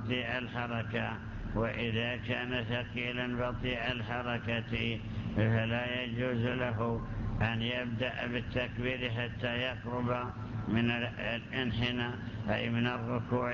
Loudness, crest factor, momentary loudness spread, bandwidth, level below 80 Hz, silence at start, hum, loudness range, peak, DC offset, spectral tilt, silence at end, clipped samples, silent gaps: -34 LUFS; 16 dB; 4 LU; 7 kHz; -48 dBFS; 0 s; none; 1 LU; -18 dBFS; under 0.1%; -7.5 dB/octave; 0 s; under 0.1%; none